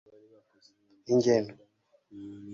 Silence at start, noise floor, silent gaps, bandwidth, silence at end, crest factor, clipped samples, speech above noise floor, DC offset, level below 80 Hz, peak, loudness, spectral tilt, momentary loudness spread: 1.1 s; -62 dBFS; none; 7.4 kHz; 0 s; 20 dB; under 0.1%; 33 dB; under 0.1%; -70 dBFS; -12 dBFS; -27 LUFS; -6 dB/octave; 23 LU